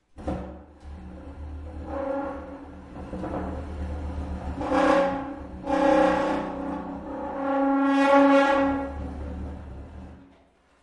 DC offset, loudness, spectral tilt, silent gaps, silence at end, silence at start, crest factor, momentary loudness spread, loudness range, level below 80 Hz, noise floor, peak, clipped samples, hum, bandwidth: under 0.1%; -25 LUFS; -7 dB/octave; none; 0.55 s; 0.15 s; 20 dB; 22 LU; 13 LU; -42 dBFS; -59 dBFS; -8 dBFS; under 0.1%; none; 11 kHz